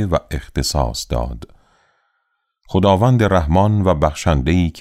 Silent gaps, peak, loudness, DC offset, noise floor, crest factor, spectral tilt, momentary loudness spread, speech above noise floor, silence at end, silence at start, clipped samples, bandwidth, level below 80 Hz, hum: none; -2 dBFS; -17 LUFS; under 0.1%; -70 dBFS; 16 dB; -6.5 dB/octave; 10 LU; 54 dB; 0 s; 0 s; under 0.1%; 15 kHz; -28 dBFS; none